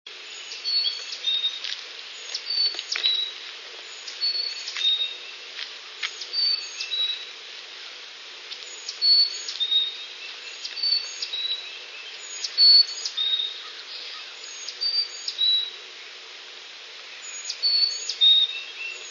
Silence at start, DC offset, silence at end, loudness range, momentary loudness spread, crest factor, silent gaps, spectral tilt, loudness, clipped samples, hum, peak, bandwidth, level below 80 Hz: 0.05 s; under 0.1%; 0 s; 6 LU; 20 LU; 22 dB; none; 4.5 dB/octave; -22 LUFS; under 0.1%; none; -6 dBFS; 7.4 kHz; under -90 dBFS